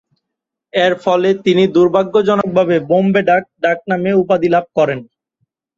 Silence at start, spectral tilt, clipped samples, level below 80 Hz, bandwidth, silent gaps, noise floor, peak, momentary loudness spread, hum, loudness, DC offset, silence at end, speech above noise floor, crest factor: 0.75 s; -7 dB/octave; under 0.1%; -56 dBFS; 7.6 kHz; none; -80 dBFS; -2 dBFS; 5 LU; none; -14 LUFS; under 0.1%; 0.75 s; 67 dB; 14 dB